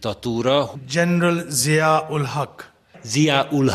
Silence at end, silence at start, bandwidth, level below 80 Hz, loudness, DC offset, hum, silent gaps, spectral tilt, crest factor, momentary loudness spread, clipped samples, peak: 0 s; 0 s; 14.5 kHz; -58 dBFS; -20 LUFS; under 0.1%; none; none; -4.5 dB/octave; 18 dB; 8 LU; under 0.1%; -2 dBFS